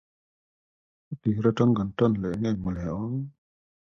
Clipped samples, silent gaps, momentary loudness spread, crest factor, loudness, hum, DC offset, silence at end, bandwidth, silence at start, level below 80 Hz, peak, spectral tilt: under 0.1%; none; 11 LU; 18 dB; -27 LUFS; none; under 0.1%; 0.5 s; 7.2 kHz; 1.1 s; -50 dBFS; -8 dBFS; -9 dB/octave